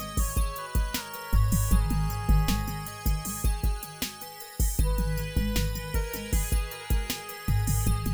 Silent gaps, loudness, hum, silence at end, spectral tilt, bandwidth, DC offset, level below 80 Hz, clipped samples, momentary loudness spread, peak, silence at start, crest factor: none; -29 LUFS; none; 0 s; -4.5 dB/octave; over 20 kHz; under 0.1%; -28 dBFS; under 0.1%; 7 LU; -12 dBFS; 0 s; 16 dB